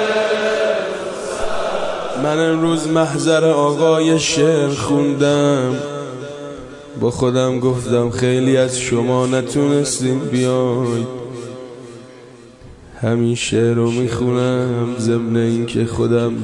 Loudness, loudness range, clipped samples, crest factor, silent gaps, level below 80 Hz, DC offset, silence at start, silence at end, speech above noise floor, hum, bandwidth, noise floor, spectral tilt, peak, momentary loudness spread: -17 LUFS; 6 LU; under 0.1%; 14 dB; none; -48 dBFS; under 0.1%; 0 s; 0 s; 24 dB; none; 11.5 kHz; -40 dBFS; -5.5 dB/octave; -2 dBFS; 13 LU